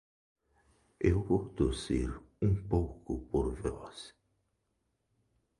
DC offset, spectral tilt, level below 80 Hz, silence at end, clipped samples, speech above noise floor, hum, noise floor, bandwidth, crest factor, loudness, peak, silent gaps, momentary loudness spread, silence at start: under 0.1%; -7.5 dB/octave; -44 dBFS; 1.5 s; under 0.1%; 48 dB; none; -80 dBFS; 11.5 kHz; 22 dB; -34 LUFS; -14 dBFS; none; 13 LU; 1 s